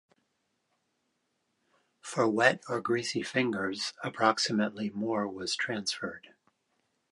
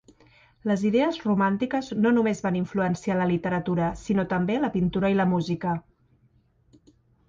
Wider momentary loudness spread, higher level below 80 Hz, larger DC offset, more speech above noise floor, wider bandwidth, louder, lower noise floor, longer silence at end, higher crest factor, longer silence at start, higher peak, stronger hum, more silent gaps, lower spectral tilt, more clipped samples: first, 10 LU vs 5 LU; second, -74 dBFS vs -54 dBFS; neither; first, 48 dB vs 39 dB; first, 11.5 kHz vs 7.6 kHz; second, -30 LUFS vs -25 LUFS; first, -78 dBFS vs -63 dBFS; second, 0.9 s vs 1.5 s; first, 26 dB vs 14 dB; first, 2.05 s vs 0.65 s; first, -6 dBFS vs -10 dBFS; neither; neither; second, -3.5 dB/octave vs -7.5 dB/octave; neither